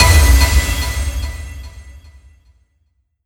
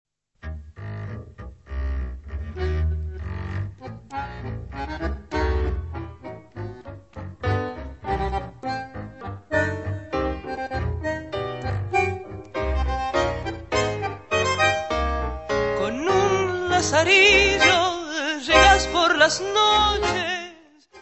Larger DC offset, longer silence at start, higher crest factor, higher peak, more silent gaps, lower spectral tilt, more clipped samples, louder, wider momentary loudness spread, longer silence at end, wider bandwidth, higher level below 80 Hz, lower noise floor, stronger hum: second, under 0.1% vs 0.1%; second, 0 s vs 0.45 s; second, 16 dB vs 22 dB; about the same, 0 dBFS vs -2 dBFS; neither; about the same, -3.5 dB/octave vs -4 dB/octave; neither; first, -15 LUFS vs -22 LUFS; first, 23 LU vs 20 LU; first, 1.35 s vs 0 s; first, 19 kHz vs 8.4 kHz; first, -18 dBFS vs -34 dBFS; first, -63 dBFS vs -50 dBFS; neither